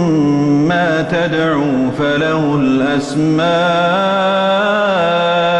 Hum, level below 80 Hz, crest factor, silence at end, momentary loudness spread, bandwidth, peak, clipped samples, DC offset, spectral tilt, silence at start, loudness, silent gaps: none; -48 dBFS; 8 dB; 0 s; 2 LU; 10.5 kHz; -4 dBFS; under 0.1%; under 0.1%; -6.5 dB/octave; 0 s; -14 LUFS; none